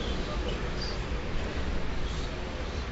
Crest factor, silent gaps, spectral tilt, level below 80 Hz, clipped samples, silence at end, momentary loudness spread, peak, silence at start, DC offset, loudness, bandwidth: 12 dB; none; -4.5 dB/octave; -34 dBFS; under 0.1%; 0 s; 2 LU; -20 dBFS; 0 s; under 0.1%; -34 LUFS; 8 kHz